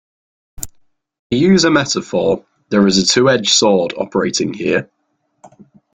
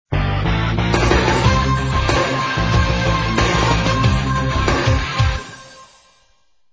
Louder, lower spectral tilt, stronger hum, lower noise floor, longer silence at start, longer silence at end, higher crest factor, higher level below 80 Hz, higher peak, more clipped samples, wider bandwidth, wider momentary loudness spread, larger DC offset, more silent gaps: first, -14 LUFS vs -17 LUFS; second, -4 dB/octave vs -5.5 dB/octave; neither; first, -67 dBFS vs -61 dBFS; first, 0.6 s vs 0.1 s; first, 1.1 s vs 0.9 s; about the same, 16 dB vs 16 dB; second, -48 dBFS vs -24 dBFS; about the same, 0 dBFS vs -2 dBFS; neither; first, 16 kHz vs 8 kHz; first, 11 LU vs 4 LU; neither; first, 1.19-1.30 s vs none